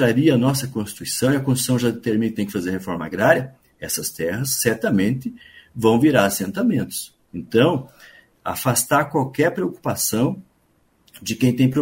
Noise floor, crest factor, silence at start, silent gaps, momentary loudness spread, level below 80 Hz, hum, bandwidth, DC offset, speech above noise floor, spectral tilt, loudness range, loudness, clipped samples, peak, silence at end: -62 dBFS; 20 dB; 0 s; none; 12 LU; -54 dBFS; none; 16.5 kHz; under 0.1%; 42 dB; -5 dB/octave; 2 LU; -20 LUFS; under 0.1%; 0 dBFS; 0 s